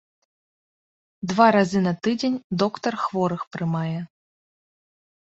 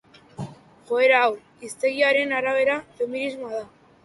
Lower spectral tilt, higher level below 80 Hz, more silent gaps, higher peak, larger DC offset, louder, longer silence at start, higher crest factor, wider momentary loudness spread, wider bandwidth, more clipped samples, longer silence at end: first, -6.5 dB/octave vs -4 dB/octave; about the same, -64 dBFS vs -66 dBFS; first, 2.44-2.50 s, 3.47-3.51 s vs none; first, -2 dBFS vs -6 dBFS; neither; about the same, -23 LUFS vs -22 LUFS; first, 1.2 s vs 0.4 s; about the same, 22 dB vs 18 dB; second, 12 LU vs 20 LU; second, 8 kHz vs 11.5 kHz; neither; first, 1.15 s vs 0.4 s